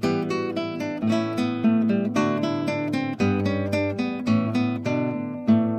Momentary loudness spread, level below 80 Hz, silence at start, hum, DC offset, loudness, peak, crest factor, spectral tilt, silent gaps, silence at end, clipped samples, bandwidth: 5 LU; -62 dBFS; 0 s; none; under 0.1%; -24 LUFS; -10 dBFS; 14 dB; -7 dB/octave; none; 0 s; under 0.1%; 11.5 kHz